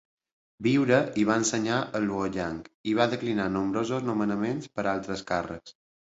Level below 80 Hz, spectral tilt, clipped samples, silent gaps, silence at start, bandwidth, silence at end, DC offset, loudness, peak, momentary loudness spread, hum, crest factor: -58 dBFS; -5 dB/octave; under 0.1%; 2.75-2.84 s; 0.6 s; 8.2 kHz; 0.4 s; under 0.1%; -27 LUFS; -8 dBFS; 8 LU; none; 20 dB